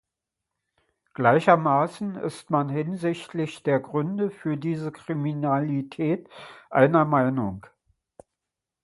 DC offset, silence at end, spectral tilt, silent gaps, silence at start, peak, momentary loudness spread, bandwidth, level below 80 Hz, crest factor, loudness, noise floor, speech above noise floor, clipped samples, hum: under 0.1%; 1.25 s; -8 dB/octave; none; 1.2 s; -2 dBFS; 12 LU; 11.5 kHz; -64 dBFS; 22 dB; -25 LUFS; -86 dBFS; 62 dB; under 0.1%; none